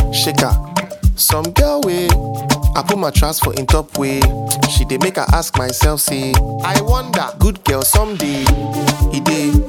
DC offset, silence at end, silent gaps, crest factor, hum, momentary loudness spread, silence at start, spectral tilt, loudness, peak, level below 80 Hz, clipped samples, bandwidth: under 0.1%; 0 s; none; 14 dB; none; 4 LU; 0 s; -4.5 dB/octave; -15 LUFS; 0 dBFS; -20 dBFS; under 0.1%; 18.5 kHz